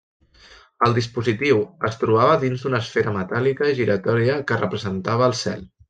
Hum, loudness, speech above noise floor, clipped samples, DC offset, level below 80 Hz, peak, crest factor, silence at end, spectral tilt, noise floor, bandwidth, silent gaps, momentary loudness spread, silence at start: none; -21 LUFS; 29 dB; under 0.1%; under 0.1%; -56 dBFS; -4 dBFS; 18 dB; 0.25 s; -6 dB/octave; -50 dBFS; 9.2 kHz; none; 6 LU; 0.8 s